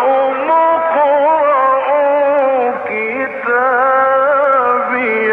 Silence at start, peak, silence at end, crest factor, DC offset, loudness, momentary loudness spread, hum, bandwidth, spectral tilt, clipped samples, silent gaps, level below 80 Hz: 0 s; -4 dBFS; 0 s; 8 dB; under 0.1%; -13 LUFS; 6 LU; none; 4.1 kHz; -6.5 dB/octave; under 0.1%; none; -64 dBFS